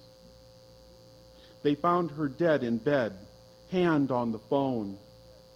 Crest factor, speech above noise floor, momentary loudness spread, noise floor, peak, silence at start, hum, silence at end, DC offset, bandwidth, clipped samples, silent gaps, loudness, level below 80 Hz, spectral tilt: 18 dB; 26 dB; 9 LU; -54 dBFS; -12 dBFS; 1.65 s; none; 0.55 s; under 0.1%; 15 kHz; under 0.1%; none; -29 LUFS; -62 dBFS; -8 dB/octave